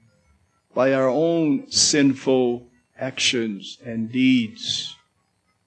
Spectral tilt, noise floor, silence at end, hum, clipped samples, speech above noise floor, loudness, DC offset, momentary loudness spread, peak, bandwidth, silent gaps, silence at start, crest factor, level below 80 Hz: -3.5 dB/octave; -68 dBFS; 0.75 s; none; under 0.1%; 47 dB; -21 LUFS; under 0.1%; 14 LU; -6 dBFS; 9.6 kHz; none; 0.75 s; 16 dB; -62 dBFS